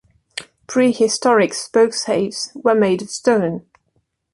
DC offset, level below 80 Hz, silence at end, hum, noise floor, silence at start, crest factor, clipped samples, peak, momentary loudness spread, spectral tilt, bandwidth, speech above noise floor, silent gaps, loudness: under 0.1%; -62 dBFS; 0.75 s; none; -67 dBFS; 0.35 s; 16 dB; under 0.1%; -2 dBFS; 17 LU; -4 dB/octave; 11.5 kHz; 50 dB; none; -17 LUFS